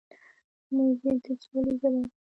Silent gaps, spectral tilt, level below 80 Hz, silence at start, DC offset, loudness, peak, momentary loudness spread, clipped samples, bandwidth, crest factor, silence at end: none; -9 dB/octave; -62 dBFS; 0.7 s; under 0.1%; -28 LUFS; -14 dBFS; 6 LU; under 0.1%; 6 kHz; 14 dB; 0.15 s